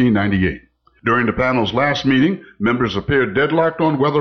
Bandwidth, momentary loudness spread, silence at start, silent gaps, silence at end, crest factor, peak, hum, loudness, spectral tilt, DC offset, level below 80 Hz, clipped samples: 6.6 kHz; 5 LU; 0 s; none; 0 s; 12 dB; -6 dBFS; none; -17 LUFS; -7 dB/octave; under 0.1%; -42 dBFS; under 0.1%